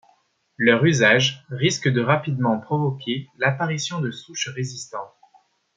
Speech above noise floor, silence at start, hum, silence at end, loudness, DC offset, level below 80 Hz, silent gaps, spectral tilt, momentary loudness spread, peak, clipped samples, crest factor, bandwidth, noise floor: 41 dB; 0.6 s; none; 0.7 s; -21 LUFS; under 0.1%; -64 dBFS; none; -4.5 dB/octave; 14 LU; -2 dBFS; under 0.1%; 20 dB; 9.2 kHz; -62 dBFS